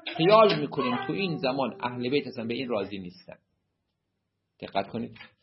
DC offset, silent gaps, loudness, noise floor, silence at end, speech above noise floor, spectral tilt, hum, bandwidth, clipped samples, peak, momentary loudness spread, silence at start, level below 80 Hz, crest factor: under 0.1%; none; -27 LUFS; -80 dBFS; 0.15 s; 53 dB; -9 dB/octave; none; 5.8 kHz; under 0.1%; -6 dBFS; 18 LU; 0.05 s; -70 dBFS; 22 dB